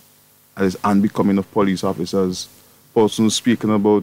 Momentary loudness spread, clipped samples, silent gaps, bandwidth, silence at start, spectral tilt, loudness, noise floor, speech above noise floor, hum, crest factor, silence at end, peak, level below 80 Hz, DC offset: 6 LU; under 0.1%; none; 16 kHz; 0.55 s; -5.5 dB/octave; -19 LUFS; -53 dBFS; 35 dB; none; 14 dB; 0 s; -6 dBFS; -56 dBFS; under 0.1%